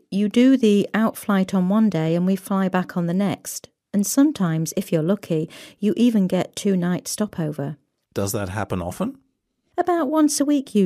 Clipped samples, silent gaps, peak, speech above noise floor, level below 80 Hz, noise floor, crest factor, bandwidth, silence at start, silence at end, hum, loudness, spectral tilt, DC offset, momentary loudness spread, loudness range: under 0.1%; none; -4 dBFS; 50 dB; -58 dBFS; -70 dBFS; 16 dB; 15.5 kHz; 0.1 s; 0 s; none; -21 LUFS; -6 dB/octave; under 0.1%; 11 LU; 6 LU